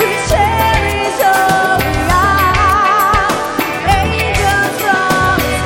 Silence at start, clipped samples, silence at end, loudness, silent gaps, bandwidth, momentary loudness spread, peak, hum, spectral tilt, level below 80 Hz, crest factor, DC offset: 0 s; under 0.1%; 0 s; -12 LUFS; none; 17 kHz; 3 LU; 0 dBFS; none; -4 dB/octave; -24 dBFS; 12 dB; 0.1%